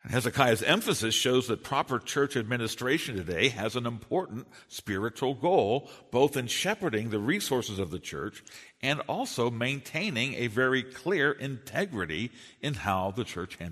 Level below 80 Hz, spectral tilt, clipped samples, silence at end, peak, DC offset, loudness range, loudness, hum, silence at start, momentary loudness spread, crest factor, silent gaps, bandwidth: -60 dBFS; -4 dB/octave; under 0.1%; 0 s; -6 dBFS; under 0.1%; 4 LU; -29 LUFS; none; 0.05 s; 11 LU; 24 dB; none; 13.5 kHz